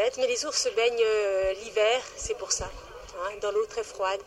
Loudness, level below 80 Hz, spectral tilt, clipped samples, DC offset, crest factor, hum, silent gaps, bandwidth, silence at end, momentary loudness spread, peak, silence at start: -27 LUFS; -50 dBFS; -1 dB/octave; under 0.1%; under 0.1%; 14 dB; none; none; 12 kHz; 0 s; 11 LU; -12 dBFS; 0 s